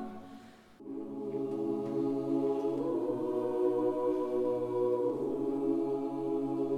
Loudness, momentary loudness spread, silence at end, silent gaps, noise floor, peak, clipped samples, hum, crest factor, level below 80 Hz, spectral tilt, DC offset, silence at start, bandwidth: -33 LUFS; 12 LU; 0 s; none; -53 dBFS; -20 dBFS; under 0.1%; none; 14 dB; -70 dBFS; -9 dB/octave; under 0.1%; 0 s; 11 kHz